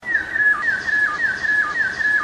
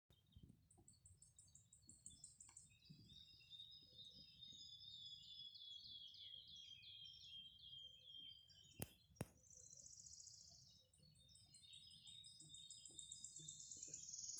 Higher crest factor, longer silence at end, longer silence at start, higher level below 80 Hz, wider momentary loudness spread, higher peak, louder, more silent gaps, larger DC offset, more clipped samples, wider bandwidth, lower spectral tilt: second, 12 dB vs 36 dB; about the same, 0 s vs 0 s; about the same, 0 s vs 0.1 s; first, -52 dBFS vs -82 dBFS; second, 4 LU vs 12 LU; first, -8 dBFS vs -26 dBFS; first, -18 LUFS vs -59 LUFS; neither; neither; neither; about the same, 11 kHz vs 10 kHz; about the same, -2.5 dB/octave vs -1.5 dB/octave